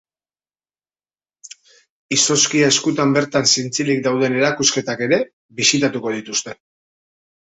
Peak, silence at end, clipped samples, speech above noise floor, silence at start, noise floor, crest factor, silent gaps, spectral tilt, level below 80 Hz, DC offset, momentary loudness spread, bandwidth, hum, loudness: -2 dBFS; 1.05 s; under 0.1%; over 72 dB; 1.45 s; under -90 dBFS; 18 dB; 1.90-2.09 s, 5.33-5.49 s; -2.5 dB/octave; -60 dBFS; under 0.1%; 9 LU; 8.4 kHz; none; -17 LUFS